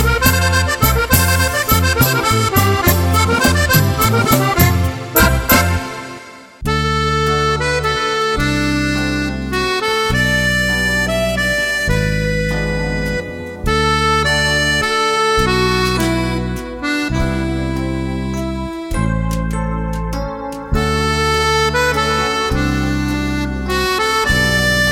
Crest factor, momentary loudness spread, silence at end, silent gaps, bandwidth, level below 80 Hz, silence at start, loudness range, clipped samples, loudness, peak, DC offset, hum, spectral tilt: 16 dB; 9 LU; 0 s; none; 17 kHz; -26 dBFS; 0 s; 6 LU; under 0.1%; -15 LUFS; 0 dBFS; under 0.1%; none; -4.5 dB/octave